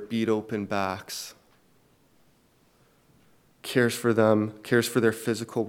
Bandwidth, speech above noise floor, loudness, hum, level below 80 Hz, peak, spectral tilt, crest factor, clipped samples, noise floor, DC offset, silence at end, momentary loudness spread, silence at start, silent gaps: 17.5 kHz; 37 dB; -26 LUFS; none; -72 dBFS; -6 dBFS; -5 dB/octave; 22 dB; under 0.1%; -63 dBFS; under 0.1%; 0 s; 14 LU; 0 s; none